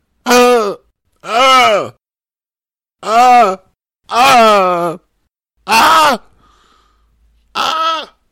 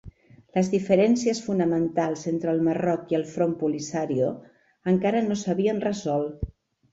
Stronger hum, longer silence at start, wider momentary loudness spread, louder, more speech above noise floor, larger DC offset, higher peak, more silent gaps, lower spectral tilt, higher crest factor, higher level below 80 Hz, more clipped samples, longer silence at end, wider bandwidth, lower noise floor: neither; first, 0.25 s vs 0.05 s; first, 20 LU vs 7 LU; first, -10 LUFS vs -25 LUFS; first, over 81 dB vs 24 dB; neither; first, -2 dBFS vs -8 dBFS; neither; second, -2.5 dB/octave vs -6.5 dB/octave; second, 12 dB vs 18 dB; about the same, -50 dBFS vs -50 dBFS; neither; second, 0.25 s vs 0.45 s; first, 16.5 kHz vs 8 kHz; first, under -90 dBFS vs -48 dBFS